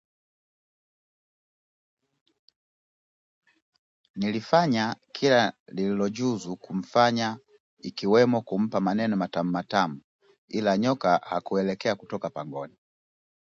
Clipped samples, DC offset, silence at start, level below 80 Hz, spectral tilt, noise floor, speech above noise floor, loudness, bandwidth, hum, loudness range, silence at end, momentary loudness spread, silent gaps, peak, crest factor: under 0.1%; under 0.1%; 4.15 s; -68 dBFS; -6 dB/octave; under -90 dBFS; over 65 dB; -26 LUFS; 7.8 kHz; none; 5 LU; 0.9 s; 13 LU; 5.60-5.66 s, 7.60-7.77 s, 10.04-10.19 s, 10.38-10.48 s; -6 dBFS; 22 dB